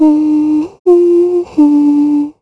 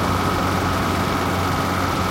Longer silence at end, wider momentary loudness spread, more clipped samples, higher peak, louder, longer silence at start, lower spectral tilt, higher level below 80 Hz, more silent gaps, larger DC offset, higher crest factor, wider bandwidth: about the same, 0.1 s vs 0 s; first, 5 LU vs 1 LU; neither; first, 0 dBFS vs -8 dBFS; first, -10 LUFS vs -21 LUFS; about the same, 0 s vs 0 s; first, -8 dB/octave vs -5 dB/octave; second, -54 dBFS vs -36 dBFS; first, 0.79-0.85 s vs none; neither; about the same, 10 dB vs 12 dB; second, 5.8 kHz vs 16 kHz